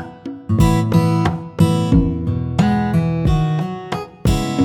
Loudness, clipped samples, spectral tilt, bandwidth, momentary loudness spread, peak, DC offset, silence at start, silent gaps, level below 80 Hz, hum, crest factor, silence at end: -17 LUFS; under 0.1%; -7.5 dB/octave; 14 kHz; 9 LU; -2 dBFS; under 0.1%; 0 s; none; -28 dBFS; none; 14 dB; 0 s